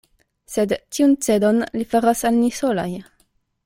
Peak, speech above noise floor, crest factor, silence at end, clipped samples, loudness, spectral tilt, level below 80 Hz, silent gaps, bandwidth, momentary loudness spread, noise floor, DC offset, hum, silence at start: -4 dBFS; 45 dB; 16 dB; 0.65 s; under 0.1%; -20 LUFS; -5 dB/octave; -54 dBFS; none; 16.5 kHz; 8 LU; -64 dBFS; under 0.1%; none; 0.5 s